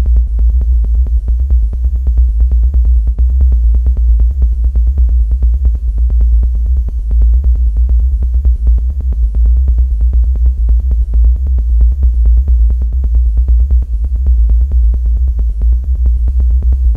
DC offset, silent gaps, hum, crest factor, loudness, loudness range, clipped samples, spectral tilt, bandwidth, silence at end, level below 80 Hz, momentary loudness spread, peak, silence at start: under 0.1%; none; none; 8 dB; -13 LUFS; 1 LU; under 0.1%; -10.5 dB/octave; 0.8 kHz; 0 s; -10 dBFS; 3 LU; 0 dBFS; 0 s